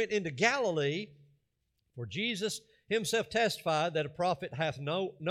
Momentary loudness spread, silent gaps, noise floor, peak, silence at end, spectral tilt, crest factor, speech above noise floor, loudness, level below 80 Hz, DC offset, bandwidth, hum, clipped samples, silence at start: 10 LU; none; -80 dBFS; -14 dBFS; 0 s; -4 dB/octave; 20 dB; 47 dB; -32 LUFS; -70 dBFS; under 0.1%; 15.5 kHz; none; under 0.1%; 0 s